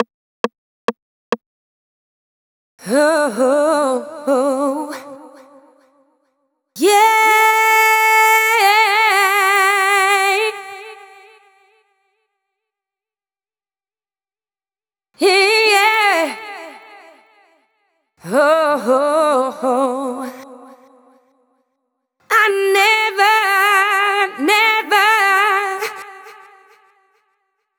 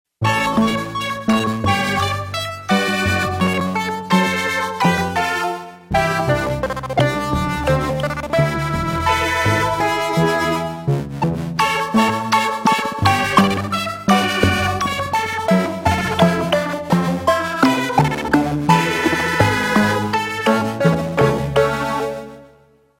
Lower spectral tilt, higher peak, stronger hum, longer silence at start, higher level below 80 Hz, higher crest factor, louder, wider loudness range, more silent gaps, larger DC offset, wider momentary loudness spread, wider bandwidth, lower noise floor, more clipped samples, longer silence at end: second, -1.5 dB/octave vs -5 dB/octave; about the same, 0 dBFS vs 0 dBFS; neither; second, 0 s vs 0.2 s; second, -82 dBFS vs -38 dBFS; about the same, 18 dB vs 18 dB; first, -14 LUFS vs -18 LUFS; first, 9 LU vs 2 LU; first, 0.14-0.44 s, 0.58-0.88 s, 1.02-1.32 s, 1.46-2.78 s vs none; neither; first, 15 LU vs 6 LU; first, over 20 kHz vs 16.5 kHz; first, under -90 dBFS vs -52 dBFS; neither; first, 1.45 s vs 0.55 s